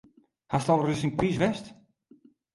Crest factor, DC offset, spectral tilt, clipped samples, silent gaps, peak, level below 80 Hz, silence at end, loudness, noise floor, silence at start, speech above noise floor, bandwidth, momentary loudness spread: 20 dB; under 0.1%; -6.5 dB/octave; under 0.1%; none; -10 dBFS; -54 dBFS; 0.8 s; -27 LUFS; -59 dBFS; 0.5 s; 33 dB; 11.5 kHz; 11 LU